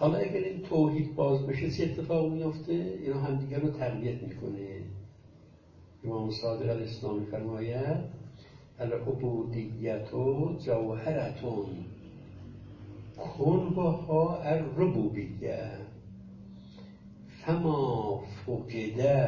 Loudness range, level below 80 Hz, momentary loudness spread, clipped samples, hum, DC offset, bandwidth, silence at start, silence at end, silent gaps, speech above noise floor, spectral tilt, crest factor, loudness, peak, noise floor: 6 LU; -56 dBFS; 20 LU; under 0.1%; none; under 0.1%; 7 kHz; 0 s; 0 s; none; 25 dB; -9 dB/octave; 18 dB; -32 LUFS; -14 dBFS; -56 dBFS